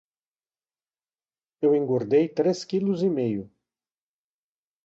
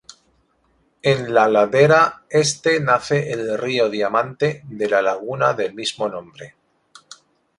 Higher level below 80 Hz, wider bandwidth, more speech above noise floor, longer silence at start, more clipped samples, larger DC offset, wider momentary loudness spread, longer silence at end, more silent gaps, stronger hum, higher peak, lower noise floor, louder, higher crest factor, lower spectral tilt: second, -70 dBFS vs -60 dBFS; second, 7.8 kHz vs 11.5 kHz; first, over 67 dB vs 44 dB; first, 1.6 s vs 1.05 s; neither; neither; second, 5 LU vs 10 LU; first, 1.4 s vs 1.1 s; neither; neither; second, -10 dBFS vs -2 dBFS; first, under -90 dBFS vs -63 dBFS; second, -24 LUFS vs -18 LUFS; about the same, 16 dB vs 18 dB; first, -7.5 dB/octave vs -4.5 dB/octave